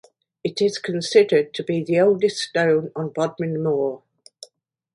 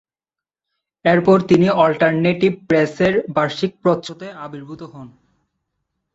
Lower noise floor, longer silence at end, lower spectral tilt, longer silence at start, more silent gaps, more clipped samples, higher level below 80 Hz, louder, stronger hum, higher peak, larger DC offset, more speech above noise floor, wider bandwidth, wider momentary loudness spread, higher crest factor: second, -60 dBFS vs -89 dBFS; second, 0.95 s vs 1.1 s; second, -5.5 dB/octave vs -7 dB/octave; second, 0.45 s vs 1.05 s; neither; neither; second, -68 dBFS vs -56 dBFS; second, -21 LUFS vs -16 LUFS; neither; about the same, -2 dBFS vs -2 dBFS; neither; second, 40 dB vs 72 dB; first, 11.5 kHz vs 7.8 kHz; second, 10 LU vs 19 LU; about the same, 18 dB vs 16 dB